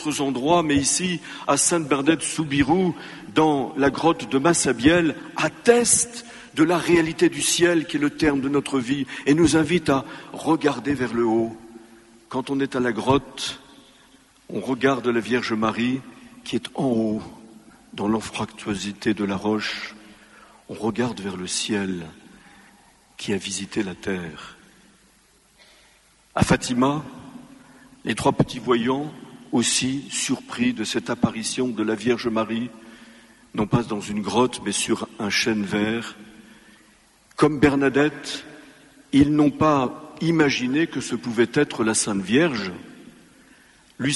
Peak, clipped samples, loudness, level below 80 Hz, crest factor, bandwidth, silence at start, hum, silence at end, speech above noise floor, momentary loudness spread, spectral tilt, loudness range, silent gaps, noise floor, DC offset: -4 dBFS; under 0.1%; -22 LUFS; -52 dBFS; 20 dB; 11.5 kHz; 0 s; none; 0 s; 36 dB; 13 LU; -4 dB/octave; 8 LU; none; -58 dBFS; under 0.1%